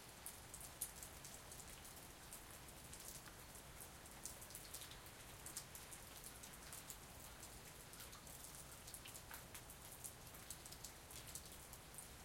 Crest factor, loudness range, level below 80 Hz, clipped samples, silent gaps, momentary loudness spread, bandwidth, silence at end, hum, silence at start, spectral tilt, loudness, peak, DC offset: 28 dB; 1 LU; -68 dBFS; under 0.1%; none; 4 LU; 16.5 kHz; 0 s; none; 0 s; -2 dB/octave; -54 LUFS; -28 dBFS; under 0.1%